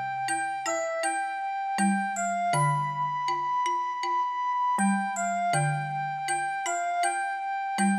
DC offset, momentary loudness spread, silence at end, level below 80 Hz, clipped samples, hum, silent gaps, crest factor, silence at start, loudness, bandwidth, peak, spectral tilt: under 0.1%; 5 LU; 0 s; -76 dBFS; under 0.1%; none; none; 14 dB; 0 s; -28 LUFS; 15 kHz; -14 dBFS; -4.5 dB/octave